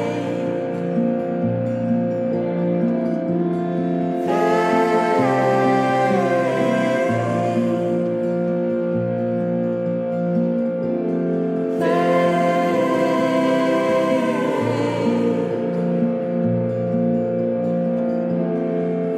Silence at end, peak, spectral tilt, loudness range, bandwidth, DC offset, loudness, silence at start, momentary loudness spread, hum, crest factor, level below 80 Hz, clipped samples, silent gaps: 0 s; -6 dBFS; -7.5 dB/octave; 3 LU; 12.5 kHz; under 0.1%; -20 LUFS; 0 s; 5 LU; none; 14 dB; -62 dBFS; under 0.1%; none